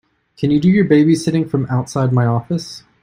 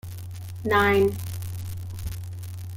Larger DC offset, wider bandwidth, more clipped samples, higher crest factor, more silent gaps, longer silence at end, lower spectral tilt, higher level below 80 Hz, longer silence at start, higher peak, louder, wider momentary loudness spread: neither; second, 14.5 kHz vs 17 kHz; neither; about the same, 16 dB vs 18 dB; neither; first, 0.25 s vs 0 s; first, -7.5 dB/octave vs -6 dB/octave; about the same, -50 dBFS vs -46 dBFS; first, 0.4 s vs 0.05 s; first, 0 dBFS vs -8 dBFS; first, -16 LUFS vs -25 LUFS; second, 11 LU vs 17 LU